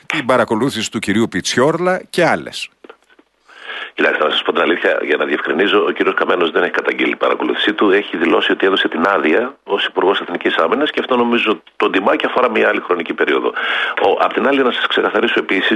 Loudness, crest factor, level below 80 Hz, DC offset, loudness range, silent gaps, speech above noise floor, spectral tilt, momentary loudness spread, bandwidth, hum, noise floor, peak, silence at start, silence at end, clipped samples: -15 LUFS; 14 dB; -60 dBFS; under 0.1%; 3 LU; none; 38 dB; -4 dB/octave; 4 LU; 12 kHz; none; -53 dBFS; 0 dBFS; 0.1 s; 0 s; under 0.1%